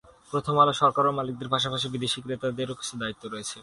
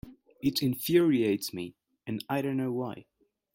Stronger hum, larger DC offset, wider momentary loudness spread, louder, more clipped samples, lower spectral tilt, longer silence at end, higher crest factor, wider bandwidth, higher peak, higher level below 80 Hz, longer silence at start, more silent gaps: neither; neither; second, 12 LU vs 16 LU; first, -26 LUFS vs -29 LUFS; neither; about the same, -4.5 dB/octave vs -5.5 dB/octave; second, 0 s vs 0.5 s; about the same, 20 dB vs 18 dB; second, 11.5 kHz vs 16.5 kHz; first, -8 dBFS vs -12 dBFS; about the same, -60 dBFS vs -64 dBFS; first, 0.3 s vs 0.05 s; neither